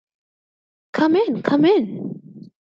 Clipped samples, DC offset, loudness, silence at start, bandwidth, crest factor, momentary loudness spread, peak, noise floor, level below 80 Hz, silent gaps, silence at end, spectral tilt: under 0.1%; under 0.1%; -19 LUFS; 0.95 s; 7.2 kHz; 18 dB; 16 LU; -2 dBFS; under -90 dBFS; -68 dBFS; none; 0.15 s; -7.5 dB/octave